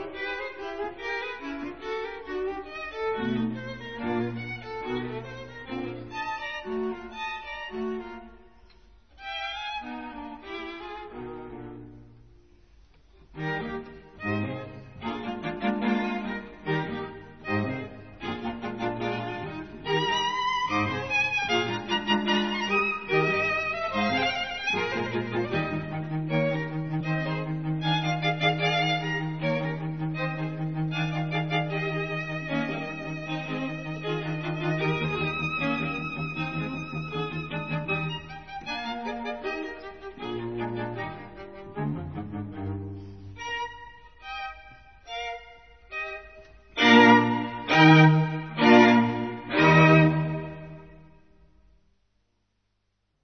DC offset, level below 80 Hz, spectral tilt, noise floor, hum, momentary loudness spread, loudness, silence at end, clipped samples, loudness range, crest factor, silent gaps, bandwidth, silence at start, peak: 0.2%; -56 dBFS; -6.5 dB/octave; -75 dBFS; none; 16 LU; -27 LUFS; 2.15 s; under 0.1%; 16 LU; 24 dB; none; 6.6 kHz; 0 s; -4 dBFS